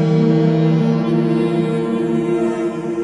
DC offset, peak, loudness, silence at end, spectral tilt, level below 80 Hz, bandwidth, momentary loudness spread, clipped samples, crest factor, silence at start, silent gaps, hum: under 0.1%; -4 dBFS; -17 LUFS; 0 s; -9 dB/octave; -54 dBFS; 10.5 kHz; 5 LU; under 0.1%; 12 dB; 0 s; none; none